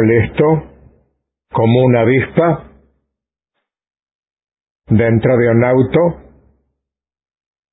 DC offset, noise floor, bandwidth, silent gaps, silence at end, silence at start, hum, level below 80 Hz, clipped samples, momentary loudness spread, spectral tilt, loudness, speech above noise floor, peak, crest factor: under 0.1%; -83 dBFS; 4 kHz; 4.15-4.23 s, 4.33-4.37 s, 4.71-4.75 s; 1.55 s; 0 s; none; -40 dBFS; under 0.1%; 7 LU; -13 dB/octave; -13 LUFS; 71 dB; 0 dBFS; 16 dB